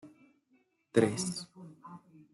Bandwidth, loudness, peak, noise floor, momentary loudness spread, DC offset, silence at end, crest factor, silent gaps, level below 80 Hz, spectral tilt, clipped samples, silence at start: 12.5 kHz; -32 LUFS; -10 dBFS; -72 dBFS; 23 LU; under 0.1%; 0.35 s; 26 dB; none; -74 dBFS; -5 dB/octave; under 0.1%; 0.05 s